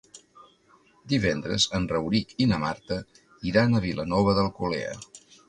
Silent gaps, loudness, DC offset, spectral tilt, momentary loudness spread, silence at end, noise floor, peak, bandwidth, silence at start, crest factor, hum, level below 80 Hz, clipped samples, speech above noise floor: none; -26 LUFS; under 0.1%; -5 dB/octave; 11 LU; 0.3 s; -60 dBFS; -8 dBFS; 10.5 kHz; 0.15 s; 18 dB; none; -48 dBFS; under 0.1%; 35 dB